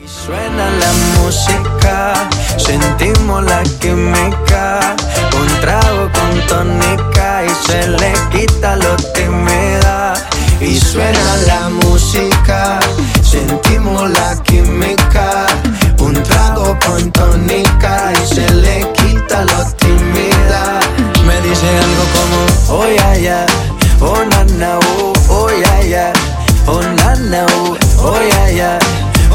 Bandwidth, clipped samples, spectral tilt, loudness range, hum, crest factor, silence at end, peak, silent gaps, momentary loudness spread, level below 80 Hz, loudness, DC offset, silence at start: 17 kHz; under 0.1%; -4.5 dB/octave; 1 LU; none; 10 dB; 0 s; 0 dBFS; none; 3 LU; -14 dBFS; -11 LUFS; under 0.1%; 0 s